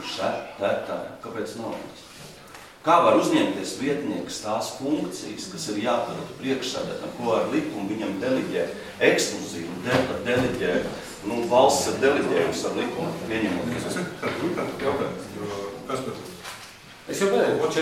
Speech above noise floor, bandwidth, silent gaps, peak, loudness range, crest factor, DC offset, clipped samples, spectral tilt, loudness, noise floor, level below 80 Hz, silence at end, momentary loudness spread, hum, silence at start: 20 dB; 16 kHz; none; -2 dBFS; 5 LU; 22 dB; under 0.1%; under 0.1%; -4.5 dB/octave; -25 LUFS; -45 dBFS; -56 dBFS; 0 s; 14 LU; none; 0 s